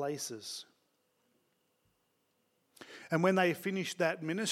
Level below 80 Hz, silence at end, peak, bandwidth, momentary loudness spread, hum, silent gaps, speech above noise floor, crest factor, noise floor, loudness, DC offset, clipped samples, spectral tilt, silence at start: under -90 dBFS; 0 s; -14 dBFS; 16.5 kHz; 16 LU; none; none; 44 dB; 22 dB; -77 dBFS; -33 LUFS; under 0.1%; under 0.1%; -4.5 dB/octave; 0 s